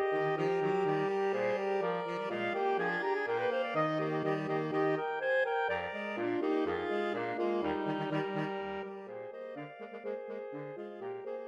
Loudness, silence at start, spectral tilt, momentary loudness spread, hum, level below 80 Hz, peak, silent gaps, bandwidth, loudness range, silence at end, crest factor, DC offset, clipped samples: -34 LUFS; 0 s; -7 dB/octave; 12 LU; none; -72 dBFS; -20 dBFS; none; 7.8 kHz; 6 LU; 0 s; 14 dB; under 0.1%; under 0.1%